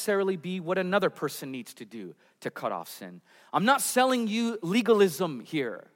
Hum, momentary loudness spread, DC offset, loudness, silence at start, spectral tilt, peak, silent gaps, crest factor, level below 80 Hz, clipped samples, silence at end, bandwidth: none; 19 LU; under 0.1%; -27 LUFS; 0 s; -4.5 dB/octave; -8 dBFS; none; 20 dB; -84 dBFS; under 0.1%; 0.15 s; 16.5 kHz